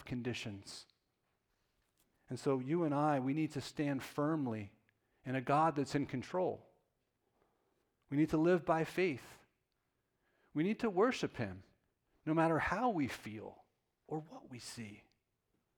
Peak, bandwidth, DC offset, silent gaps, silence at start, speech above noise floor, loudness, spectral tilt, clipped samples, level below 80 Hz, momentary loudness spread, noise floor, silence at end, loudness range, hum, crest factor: -20 dBFS; 17.5 kHz; under 0.1%; none; 0 s; 48 dB; -37 LUFS; -6.5 dB/octave; under 0.1%; -68 dBFS; 17 LU; -84 dBFS; 0.75 s; 3 LU; none; 18 dB